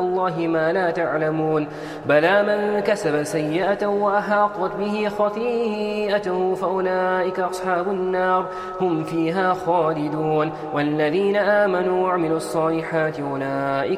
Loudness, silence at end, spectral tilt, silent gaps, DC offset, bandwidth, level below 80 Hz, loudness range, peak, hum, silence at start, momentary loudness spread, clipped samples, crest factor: -21 LUFS; 0 s; -6 dB/octave; none; under 0.1%; 14 kHz; -56 dBFS; 2 LU; -4 dBFS; none; 0 s; 5 LU; under 0.1%; 16 dB